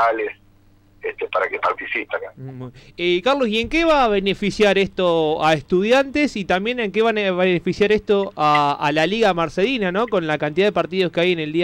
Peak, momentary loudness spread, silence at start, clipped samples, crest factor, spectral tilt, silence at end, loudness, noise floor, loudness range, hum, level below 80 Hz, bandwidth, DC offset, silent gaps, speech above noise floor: -6 dBFS; 9 LU; 0 s; under 0.1%; 12 dB; -5.5 dB/octave; 0 s; -19 LUFS; -52 dBFS; 4 LU; none; -44 dBFS; 12 kHz; under 0.1%; none; 33 dB